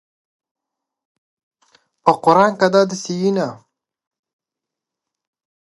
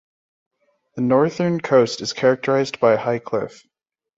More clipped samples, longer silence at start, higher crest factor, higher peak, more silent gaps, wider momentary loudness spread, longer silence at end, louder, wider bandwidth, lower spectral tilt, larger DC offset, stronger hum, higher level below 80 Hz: neither; first, 2.05 s vs 0.95 s; about the same, 20 dB vs 18 dB; first, 0 dBFS vs -4 dBFS; neither; about the same, 8 LU vs 9 LU; first, 2.05 s vs 0.7 s; first, -16 LUFS vs -19 LUFS; first, 11.5 kHz vs 8 kHz; about the same, -5.5 dB/octave vs -5.5 dB/octave; neither; neither; second, -70 dBFS vs -62 dBFS